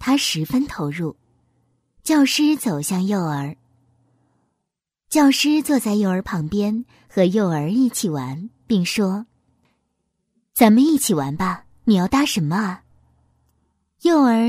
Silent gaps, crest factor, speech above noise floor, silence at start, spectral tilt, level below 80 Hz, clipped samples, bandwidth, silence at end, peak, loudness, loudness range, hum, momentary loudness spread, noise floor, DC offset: none; 20 dB; 62 dB; 0 s; -5 dB/octave; -52 dBFS; under 0.1%; 16 kHz; 0 s; 0 dBFS; -19 LUFS; 3 LU; none; 13 LU; -80 dBFS; under 0.1%